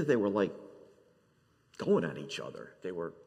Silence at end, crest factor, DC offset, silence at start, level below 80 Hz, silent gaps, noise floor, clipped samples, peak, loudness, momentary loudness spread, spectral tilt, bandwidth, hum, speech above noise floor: 0.15 s; 20 dB; under 0.1%; 0 s; -78 dBFS; none; -69 dBFS; under 0.1%; -16 dBFS; -34 LUFS; 20 LU; -6.5 dB/octave; 9.8 kHz; none; 37 dB